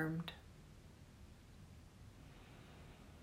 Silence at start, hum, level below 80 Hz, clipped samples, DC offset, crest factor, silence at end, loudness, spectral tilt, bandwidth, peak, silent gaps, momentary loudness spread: 0 s; none; -64 dBFS; under 0.1%; under 0.1%; 22 dB; 0 s; -55 LUFS; -6.5 dB/octave; 16 kHz; -30 dBFS; none; 13 LU